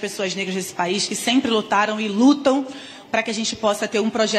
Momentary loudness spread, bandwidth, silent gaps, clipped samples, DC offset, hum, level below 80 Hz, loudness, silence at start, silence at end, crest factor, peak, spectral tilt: 8 LU; 14.5 kHz; none; under 0.1%; under 0.1%; none; -64 dBFS; -20 LUFS; 0 s; 0 s; 16 dB; -6 dBFS; -3.5 dB/octave